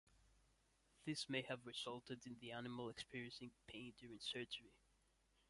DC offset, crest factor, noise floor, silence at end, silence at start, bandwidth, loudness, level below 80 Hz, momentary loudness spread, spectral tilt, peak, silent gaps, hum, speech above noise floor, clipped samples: under 0.1%; 22 dB; -80 dBFS; 0.75 s; 0.1 s; 11.5 kHz; -51 LUFS; -80 dBFS; 11 LU; -4 dB/octave; -30 dBFS; none; none; 28 dB; under 0.1%